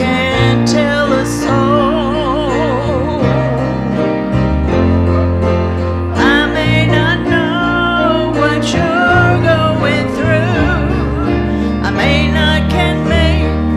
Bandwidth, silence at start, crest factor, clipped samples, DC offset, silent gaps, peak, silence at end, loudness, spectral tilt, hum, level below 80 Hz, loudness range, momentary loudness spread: 12.5 kHz; 0 s; 12 dB; under 0.1%; under 0.1%; none; 0 dBFS; 0 s; -13 LUFS; -6.5 dB/octave; none; -24 dBFS; 2 LU; 4 LU